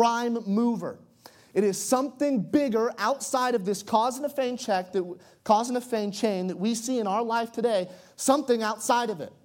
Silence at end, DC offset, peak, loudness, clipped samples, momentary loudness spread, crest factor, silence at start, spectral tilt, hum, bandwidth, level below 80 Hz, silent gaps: 0.15 s; under 0.1%; -8 dBFS; -26 LUFS; under 0.1%; 7 LU; 18 dB; 0 s; -4.5 dB/octave; none; 17 kHz; -74 dBFS; none